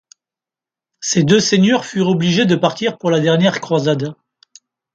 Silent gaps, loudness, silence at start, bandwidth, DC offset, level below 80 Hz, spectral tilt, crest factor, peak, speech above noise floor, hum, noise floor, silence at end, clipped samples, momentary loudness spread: none; -15 LUFS; 1 s; 8.8 kHz; under 0.1%; -58 dBFS; -5 dB/octave; 16 dB; 0 dBFS; 74 dB; none; -89 dBFS; 0.8 s; under 0.1%; 7 LU